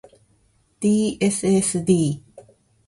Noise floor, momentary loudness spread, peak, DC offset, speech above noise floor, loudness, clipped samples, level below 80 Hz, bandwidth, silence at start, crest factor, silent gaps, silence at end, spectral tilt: -62 dBFS; 6 LU; -6 dBFS; under 0.1%; 42 dB; -20 LUFS; under 0.1%; -56 dBFS; 11.5 kHz; 0.8 s; 18 dB; none; 0.5 s; -5.5 dB/octave